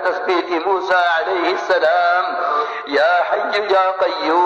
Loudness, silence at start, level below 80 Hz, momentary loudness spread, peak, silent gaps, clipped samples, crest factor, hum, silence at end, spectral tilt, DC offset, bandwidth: -17 LUFS; 0 s; -64 dBFS; 4 LU; -6 dBFS; none; under 0.1%; 10 dB; none; 0 s; -3 dB/octave; under 0.1%; 8.4 kHz